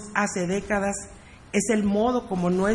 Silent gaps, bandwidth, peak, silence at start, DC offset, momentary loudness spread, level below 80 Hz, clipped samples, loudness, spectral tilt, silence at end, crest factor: none; 11.5 kHz; -6 dBFS; 0 s; under 0.1%; 6 LU; -48 dBFS; under 0.1%; -25 LUFS; -5 dB/octave; 0 s; 20 dB